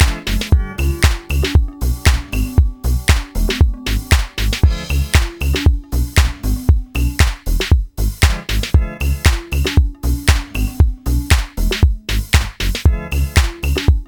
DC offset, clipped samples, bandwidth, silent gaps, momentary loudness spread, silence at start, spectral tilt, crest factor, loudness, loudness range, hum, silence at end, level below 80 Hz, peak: 0.1%; under 0.1%; 19.5 kHz; none; 5 LU; 0 s; -4.5 dB/octave; 14 dB; -17 LUFS; 1 LU; none; 0.05 s; -16 dBFS; 0 dBFS